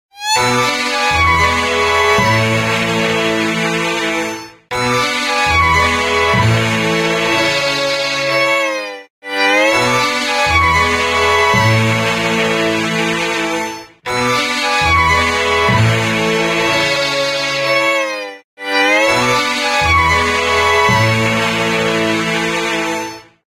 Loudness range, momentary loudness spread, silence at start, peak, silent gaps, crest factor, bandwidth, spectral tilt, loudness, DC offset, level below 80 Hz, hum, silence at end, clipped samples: 2 LU; 7 LU; 0.15 s; 0 dBFS; 9.10-9.22 s, 18.44-18.57 s; 14 dB; 16.5 kHz; -3.5 dB/octave; -13 LUFS; under 0.1%; -38 dBFS; none; 0.25 s; under 0.1%